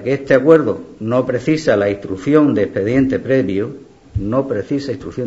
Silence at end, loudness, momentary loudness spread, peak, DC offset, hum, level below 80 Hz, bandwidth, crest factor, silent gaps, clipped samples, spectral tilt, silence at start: 0 s; -16 LUFS; 11 LU; 0 dBFS; 0.1%; none; -42 dBFS; 8 kHz; 16 dB; none; under 0.1%; -7.5 dB/octave; 0 s